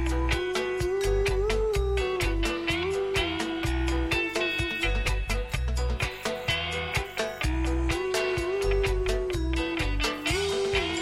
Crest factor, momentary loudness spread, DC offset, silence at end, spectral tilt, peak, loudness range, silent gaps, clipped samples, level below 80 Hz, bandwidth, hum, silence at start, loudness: 14 dB; 3 LU; under 0.1%; 0 s; -4.5 dB/octave; -12 dBFS; 1 LU; none; under 0.1%; -32 dBFS; 16 kHz; none; 0 s; -28 LUFS